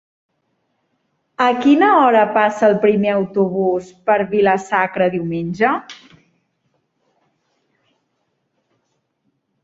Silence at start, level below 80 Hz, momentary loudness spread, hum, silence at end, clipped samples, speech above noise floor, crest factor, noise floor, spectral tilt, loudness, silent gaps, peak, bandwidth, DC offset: 1.4 s; -60 dBFS; 10 LU; none; 3.7 s; under 0.1%; 54 dB; 16 dB; -70 dBFS; -6.5 dB/octave; -16 LUFS; none; -2 dBFS; 8 kHz; under 0.1%